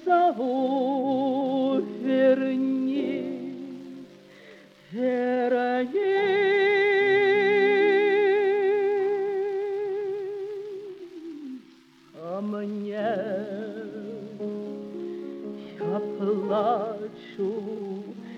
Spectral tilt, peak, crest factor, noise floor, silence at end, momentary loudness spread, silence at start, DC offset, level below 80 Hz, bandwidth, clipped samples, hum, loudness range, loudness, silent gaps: -7 dB/octave; -10 dBFS; 16 dB; -54 dBFS; 0 s; 18 LU; 0 s; under 0.1%; -78 dBFS; 6.4 kHz; under 0.1%; none; 12 LU; -25 LUFS; none